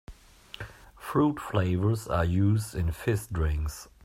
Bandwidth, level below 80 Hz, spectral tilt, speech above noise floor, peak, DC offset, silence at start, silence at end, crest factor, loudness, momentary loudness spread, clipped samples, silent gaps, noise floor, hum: 15.5 kHz; -40 dBFS; -7 dB/octave; 23 dB; -10 dBFS; under 0.1%; 0.1 s; 0.2 s; 18 dB; -28 LUFS; 17 LU; under 0.1%; none; -50 dBFS; none